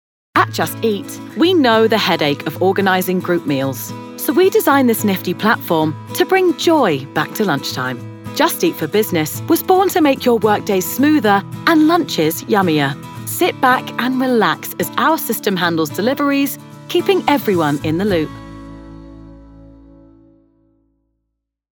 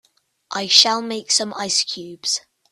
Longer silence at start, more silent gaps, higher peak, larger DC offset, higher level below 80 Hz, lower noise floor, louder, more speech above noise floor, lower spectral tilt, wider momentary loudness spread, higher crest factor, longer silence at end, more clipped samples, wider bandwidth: second, 0.35 s vs 0.5 s; neither; about the same, 0 dBFS vs 0 dBFS; neither; first, -50 dBFS vs -70 dBFS; first, -75 dBFS vs -39 dBFS; about the same, -16 LUFS vs -18 LUFS; first, 59 dB vs 19 dB; first, -4.5 dB/octave vs -0.5 dB/octave; second, 9 LU vs 13 LU; second, 16 dB vs 22 dB; first, 2.1 s vs 0.3 s; neither; first, over 20 kHz vs 15.5 kHz